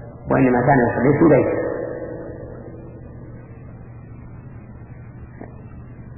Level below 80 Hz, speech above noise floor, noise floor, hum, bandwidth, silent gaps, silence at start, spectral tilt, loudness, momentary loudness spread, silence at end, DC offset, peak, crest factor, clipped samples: -44 dBFS; 23 dB; -38 dBFS; none; 2.9 kHz; none; 0 s; -13.5 dB/octave; -18 LUFS; 24 LU; 0 s; under 0.1%; -4 dBFS; 18 dB; under 0.1%